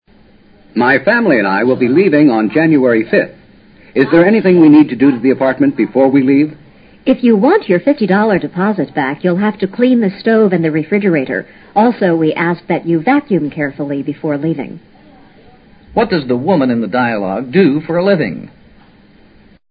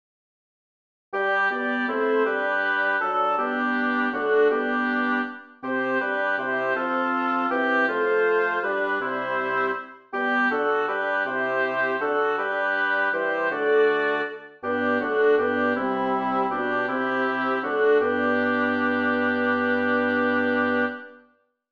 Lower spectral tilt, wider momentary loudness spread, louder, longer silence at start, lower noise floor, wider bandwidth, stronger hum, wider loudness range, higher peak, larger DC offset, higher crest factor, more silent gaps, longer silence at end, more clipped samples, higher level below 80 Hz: first, -11 dB/octave vs -6 dB/octave; first, 10 LU vs 5 LU; first, -12 LUFS vs -23 LUFS; second, 0.75 s vs 1.1 s; second, -45 dBFS vs -62 dBFS; second, 5.2 kHz vs 6.6 kHz; neither; first, 6 LU vs 2 LU; first, 0 dBFS vs -10 dBFS; neither; about the same, 12 dB vs 14 dB; neither; first, 1.25 s vs 0.55 s; neither; first, -52 dBFS vs -72 dBFS